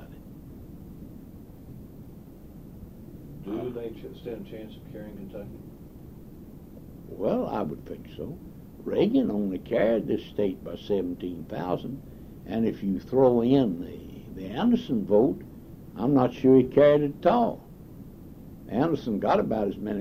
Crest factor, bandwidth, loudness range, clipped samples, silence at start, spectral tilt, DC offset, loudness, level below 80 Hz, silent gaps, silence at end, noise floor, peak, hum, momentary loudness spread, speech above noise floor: 20 dB; 15.5 kHz; 17 LU; under 0.1%; 0 s; -8.5 dB/octave; under 0.1%; -26 LUFS; -50 dBFS; none; 0 s; -45 dBFS; -8 dBFS; none; 24 LU; 20 dB